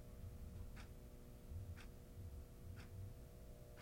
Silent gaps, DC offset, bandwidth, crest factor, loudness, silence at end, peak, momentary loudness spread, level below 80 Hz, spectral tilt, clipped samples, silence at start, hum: none; under 0.1%; 16.5 kHz; 12 dB; -57 LUFS; 0 s; -42 dBFS; 5 LU; -58 dBFS; -6 dB/octave; under 0.1%; 0 s; none